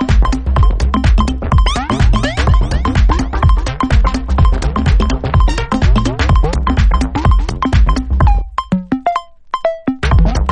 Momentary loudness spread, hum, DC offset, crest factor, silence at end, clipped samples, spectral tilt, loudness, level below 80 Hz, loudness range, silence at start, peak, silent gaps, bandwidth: 4 LU; none; under 0.1%; 12 dB; 0 s; under 0.1%; -6.5 dB/octave; -14 LUFS; -14 dBFS; 1 LU; 0 s; 0 dBFS; none; 9.4 kHz